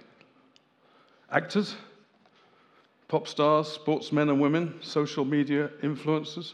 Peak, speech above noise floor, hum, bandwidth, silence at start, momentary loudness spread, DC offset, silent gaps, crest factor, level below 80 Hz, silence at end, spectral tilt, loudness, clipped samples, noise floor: -8 dBFS; 36 dB; none; 9.6 kHz; 1.3 s; 7 LU; under 0.1%; none; 22 dB; -88 dBFS; 0 s; -6.5 dB/octave; -28 LUFS; under 0.1%; -63 dBFS